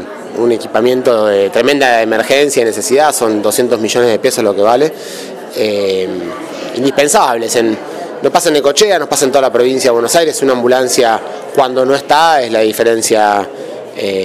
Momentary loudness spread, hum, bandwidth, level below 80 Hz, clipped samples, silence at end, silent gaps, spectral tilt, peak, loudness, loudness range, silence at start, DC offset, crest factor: 11 LU; none; 16 kHz; -56 dBFS; 0.2%; 0 s; none; -3 dB/octave; 0 dBFS; -11 LUFS; 3 LU; 0 s; under 0.1%; 12 dB